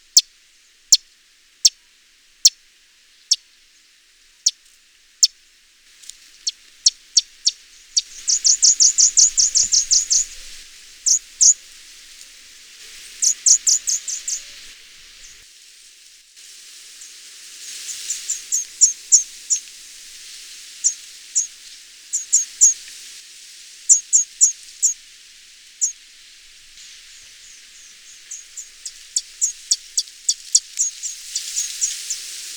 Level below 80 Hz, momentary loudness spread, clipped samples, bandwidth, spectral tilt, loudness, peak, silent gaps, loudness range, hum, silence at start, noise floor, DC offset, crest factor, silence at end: -58 dBFS; 25 LU; under 0.1%; over 20 kHz; 6 dB/octave; -17 LUFS; 0 dBFS; none; 15 LU; none; 0.15 s; -54 dBFS; under 0.1%; 22 dB; 0 s